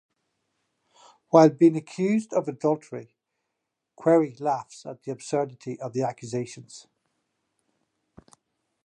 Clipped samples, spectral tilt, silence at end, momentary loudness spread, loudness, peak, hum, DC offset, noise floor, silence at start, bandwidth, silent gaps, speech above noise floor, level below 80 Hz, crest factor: under 0.1%; -7 dB/octave; 2.05 s; 20 LU; -24 LUFS; -2 dBFS; none; under 0.1%; -82 dBFS; 1.35 s; 9.6 kHz; none; 58 dB; -76 dBFS; 24 dB